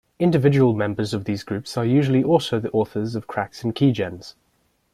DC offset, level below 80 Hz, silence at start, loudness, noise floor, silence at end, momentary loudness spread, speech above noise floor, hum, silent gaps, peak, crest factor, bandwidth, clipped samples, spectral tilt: under 0.1%; -56 dBFS; 0.2 s; -21 LUFS; -66 dBFS; 0.65 s; 10 LU; 46 dB; none; none; -4 dBFS; 18 dB; 13.5 kHz; under 0.1%; -7.5 dB/octave